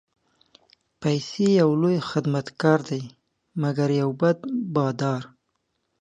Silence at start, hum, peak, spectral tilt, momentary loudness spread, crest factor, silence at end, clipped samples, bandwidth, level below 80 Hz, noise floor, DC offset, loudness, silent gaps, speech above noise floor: 1 s; none; -4 dBFS; -7 dB/octave; 12 LU; 20 dB; 0.75 s; under 0.1%; 9.6 kHz; -68 dBFS; -75 dBFS; under 0.1%; -24 LUFS; none; 52 dB